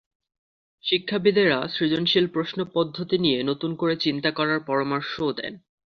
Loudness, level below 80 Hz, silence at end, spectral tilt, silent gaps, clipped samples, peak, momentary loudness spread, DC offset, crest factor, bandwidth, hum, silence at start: -24 LUFS; -62 dBFS; 0.4 s; -7 dB/octave; none; under 0.1%; -6 dBFS; 7 LU; under 0.1%; 18 dB; 6.4 kHz; none; 0.85 s